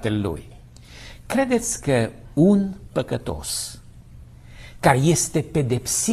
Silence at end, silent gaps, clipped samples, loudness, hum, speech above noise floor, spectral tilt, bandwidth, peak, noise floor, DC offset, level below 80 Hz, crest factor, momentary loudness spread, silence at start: 0 s; none; under 0.1%; -22 LUFS; none; 22 dB; -5 dB/octave; 14 kHz; -2 dBFS; -43 dBFS; under 0.1%; -44 dBFS; 20 dB; 13 LU; 0 s